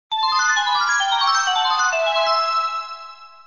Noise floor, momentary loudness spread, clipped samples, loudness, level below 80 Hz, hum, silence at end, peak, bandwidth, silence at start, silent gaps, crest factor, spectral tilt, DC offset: -40 dBFS; 11 LU; under 0.1%; -18 LUFS; -68 dBFS; none; 0.2 s; -8 dBFS; 7.4 kHz; 0.1 s; none; 12 dB; 3.5 dB/octave; 0.2%